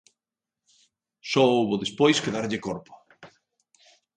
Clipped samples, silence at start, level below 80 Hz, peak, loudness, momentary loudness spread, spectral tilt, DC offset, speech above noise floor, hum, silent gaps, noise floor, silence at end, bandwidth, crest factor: under 0.1%; 1.25 s; -66 dBFS; -6 dBFS; -24 LUFS; 14 LU; -4.5 dB/octave; under 0.1%; 66 dB; none; none; -89 dBFS; 0.9 s; 10 kHz; 22 dB